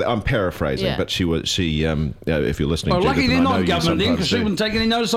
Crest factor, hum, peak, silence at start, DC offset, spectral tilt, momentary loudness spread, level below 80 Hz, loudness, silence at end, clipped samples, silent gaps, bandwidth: 14 dB; none; -6 dBFS; 0 s; under 0.1%; -5 dB/octave; 5 LU; -34 dBFS; -20 LUFS; 0 s; under 0.1%; none; 16 kHz